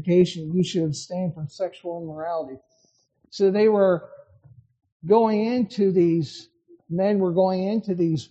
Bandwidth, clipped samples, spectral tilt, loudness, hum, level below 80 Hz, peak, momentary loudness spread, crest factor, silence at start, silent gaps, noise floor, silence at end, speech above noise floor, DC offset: 8.8 kHz; under 0.1%; -7 dB/octave; -23 LUFS; none; -64 dBFS; -6 dBFS; 13 LU; 18 dB; 0 s; 4.92-5.00 s; -65 dBFS; 0.05 s; 43 dB; under 0.1%